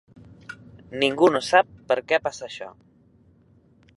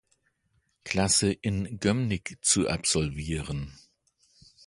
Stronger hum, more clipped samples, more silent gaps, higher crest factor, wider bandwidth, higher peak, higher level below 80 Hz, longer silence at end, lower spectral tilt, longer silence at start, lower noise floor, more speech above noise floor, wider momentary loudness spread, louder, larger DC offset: neither; neither; neither; about the same, 22 dB vs 22 dB; about the same, 11.5 kHz vs 11.5 kHz; first, -2 dBFS vs -8 dBFS; second, -62 dBFS vs -46 dBFS; first, 1.3 s vs 0.95 s; about the same, -4 dB/octave vs -3.5 dB/octave; second, 0.5 s vs 0.85 s; second, -57 dBFS vs -73 dBFS; second, 35 dB vs 45 dB; first, 23 LU vs 12 LU; first, -22 LUFS vs -27 LUFS; neither